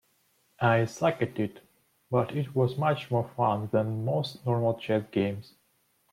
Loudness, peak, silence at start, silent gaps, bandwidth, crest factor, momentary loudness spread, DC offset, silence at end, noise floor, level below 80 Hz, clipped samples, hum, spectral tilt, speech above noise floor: -28 LUFS; -12 dBFS; 0.6 s; none; 14.5 kHz; 16 dB; 6 LU; under 0.1%; 0.7 s; -70 dBFS; -68 dBFS; under 0.1%; none; -7.5 dB/octave; 43 dB